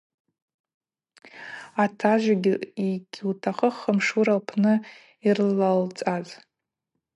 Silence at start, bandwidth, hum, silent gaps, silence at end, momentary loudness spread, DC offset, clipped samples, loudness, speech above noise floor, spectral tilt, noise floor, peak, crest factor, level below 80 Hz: 1.35 s; 11 kHz; none; none; 0.8 s; 11 LU; under 0.1%; under 0.1%; -24 LUFS; 58 dB; -6.5 dB/octave; -82 dBFS; -8 dBFS; 18 dB; -78 dBFS